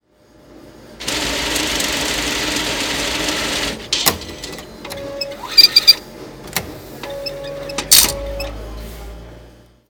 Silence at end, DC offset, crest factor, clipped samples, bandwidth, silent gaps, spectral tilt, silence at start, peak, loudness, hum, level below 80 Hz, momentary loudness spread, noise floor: 0.4 s; under 0.1%; 20 dB; 0.2%; over 20 kHz; none; -1 dB/octave; 0.5 s; 0 dBFS; -15 LUFS; none; -38 dBFS; 23 LU; -49 dBFS